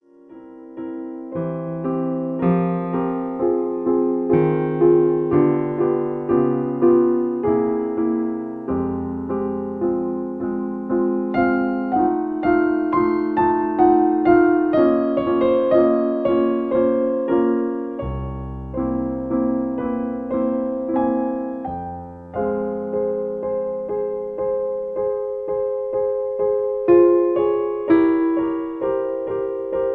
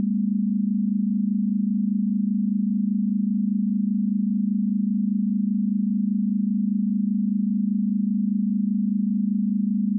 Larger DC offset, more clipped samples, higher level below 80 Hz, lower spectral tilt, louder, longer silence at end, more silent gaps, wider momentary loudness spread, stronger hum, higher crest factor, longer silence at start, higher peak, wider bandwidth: neither; neither; first, -46 dBFS vs under -90 dBFS; second, -11 dB/octave vs -17 dB/octave; first, -20 LUFS vs -23 LUFS; about the same, 0 s vs 0 s; neither; first, 10 LU vs 0 LU; neither; first, 16 dB vs 8 dB; first, 0.3 s vs 0 s; first, -2 dBFS vs -16 dBFS; first, 4.5 kHz vs 0.3 kHz